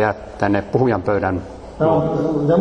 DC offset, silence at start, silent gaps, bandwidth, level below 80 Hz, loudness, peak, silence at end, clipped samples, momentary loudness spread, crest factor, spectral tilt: under 0.1%; 0 s; none; 8.8 kHz; -42 dBFS; -19 LUFS; -2 dBFS; 0 s; under 0.1%; 6 LU; 16 dB; -8.5 dB/octave